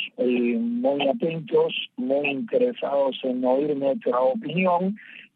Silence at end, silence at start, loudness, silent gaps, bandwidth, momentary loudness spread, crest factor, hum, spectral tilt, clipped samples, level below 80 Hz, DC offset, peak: 0.15 s; 0 s; -24 LUFS; none; 4.7 kHz; 3 LU; 14 dB; none; -9 dB/octave; under 0.1%; -80 dBFS; under 0.1%; -10 dBFS